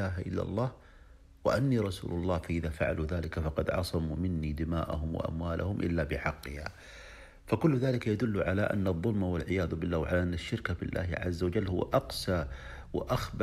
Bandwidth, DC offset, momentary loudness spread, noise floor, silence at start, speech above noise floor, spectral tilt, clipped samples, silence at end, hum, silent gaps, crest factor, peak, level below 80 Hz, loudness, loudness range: 15 kHz; under 0.1%; 8 LU; -55 dBFS; 0 s; 24 dB; -7 dB/octave; under 0.1%; 0 s; none; none; 20 dB; -12 dBFS; -44 dBFS; -32 LUFS; 3 LU